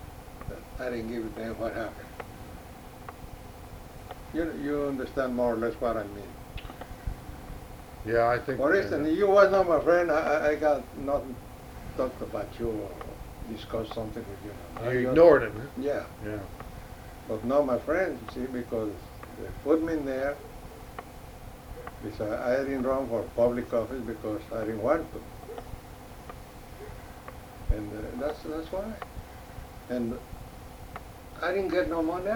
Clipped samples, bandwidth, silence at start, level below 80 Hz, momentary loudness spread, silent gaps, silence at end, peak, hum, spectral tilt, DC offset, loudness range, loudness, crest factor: under 0.1%; over 20 kHz; 0 s; -46 dBFS; 20 LU; none; 0 s; -8 dBFS; none; -6.5 dB/octave; under 0.1%; 13 LU; -28 LUFS; 22 dB